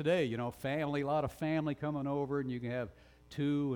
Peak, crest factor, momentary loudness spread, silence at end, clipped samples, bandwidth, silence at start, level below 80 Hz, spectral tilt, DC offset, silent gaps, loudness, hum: -20 dBFS; 14 dB; 6 LU; 0 s; under 0.1%; 18.5 kHz; 0 s; -62 dBFS; -7.5 dB/octave; under 0.1%; none; -36 LUFS; none